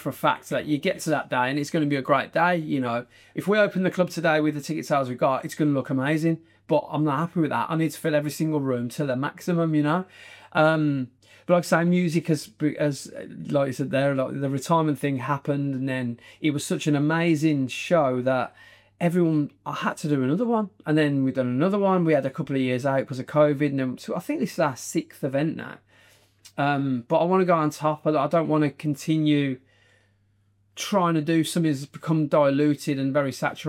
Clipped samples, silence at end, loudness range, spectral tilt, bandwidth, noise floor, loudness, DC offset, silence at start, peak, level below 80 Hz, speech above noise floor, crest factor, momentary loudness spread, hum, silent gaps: under 0.1%; 0 s; 2 LU; -6.5 dB/octave; 16.5 kHz; -65 dBFS; -24 LUFS; under 0.1%; 0 s; -6 dBFS; -70 dBFS; 41 dB; 18 dB; 8 LU; none; none